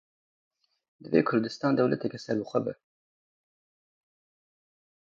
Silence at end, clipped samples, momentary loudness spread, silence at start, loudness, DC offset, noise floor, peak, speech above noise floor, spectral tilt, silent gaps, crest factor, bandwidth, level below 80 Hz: 2.3 s; under 0.1%; 7 LU; 1.05 s; -28 LUFS; under 0.1%; under -90 dBFS; -10 dBFS; over 63 dB; -7 dB/octave; none; 22 dB; 7.8 kHz; -72 dBFS